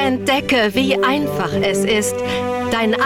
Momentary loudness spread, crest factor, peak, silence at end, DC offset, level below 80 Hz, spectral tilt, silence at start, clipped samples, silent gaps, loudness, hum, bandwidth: 5 LU; 10 dB; -6 dBFS; 0 s; under 0.1%; -46 dBFS; -4 dB/octave; 0 s; under 0.1%; none; -17 LUFS; none; 17.5 kHz